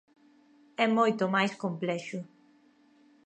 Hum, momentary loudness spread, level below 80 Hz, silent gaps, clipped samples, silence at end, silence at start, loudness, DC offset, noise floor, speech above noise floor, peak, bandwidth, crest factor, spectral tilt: none; 17 LU; -84 dBFS; none; under 0.1%; 1 s; 0.8 s; -29 LUFS; under 0.1%; -63 dBFS; 34 dB; -12 dBFS; 9 kHz; 20 dB; -5.5 dB/octave